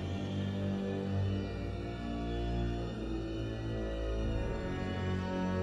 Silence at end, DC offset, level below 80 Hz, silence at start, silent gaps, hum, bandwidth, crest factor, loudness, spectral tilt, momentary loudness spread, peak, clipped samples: 0 s; under 0.1%; -42 dBFS; 0 s; none; none; 9.2 kHz; 12 dB; -37 LUFS; -7.5 dB/octave; 4 LU; -24 dBFS; under 0.1%